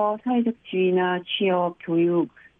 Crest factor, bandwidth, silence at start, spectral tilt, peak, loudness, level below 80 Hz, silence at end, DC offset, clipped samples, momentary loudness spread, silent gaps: 10 dB; 3.9 kHz; 0 s; -9.5 dB/octave; -12 dBFS; -23 LUFS; -70 dBFS; 0.3 s; under 0.1%; under 0.1%; 4 LU; none